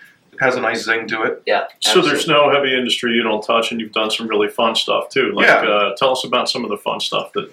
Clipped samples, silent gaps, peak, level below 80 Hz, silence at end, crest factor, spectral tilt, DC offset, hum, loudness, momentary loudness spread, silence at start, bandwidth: under 0.1%; none; 0 dBFS; -70 dBFS; 0.05 s; 16 dB; -3 dB/octave; under 0.1%; none; -16 LUFS; 7 LU; 0.4 s; 17 kHz